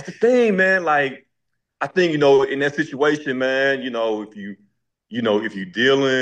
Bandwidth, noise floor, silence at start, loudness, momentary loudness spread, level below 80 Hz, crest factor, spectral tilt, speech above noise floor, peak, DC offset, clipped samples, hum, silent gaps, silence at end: 8.8 kHz; -77 dBFS; 0 s; -19 LUFS; 12 LU; -68 dBFS; 14 dB; -5 dB/octave; 58 dB; -4 dBFS; under 0.1%; under 0.1%; none; none; 0 s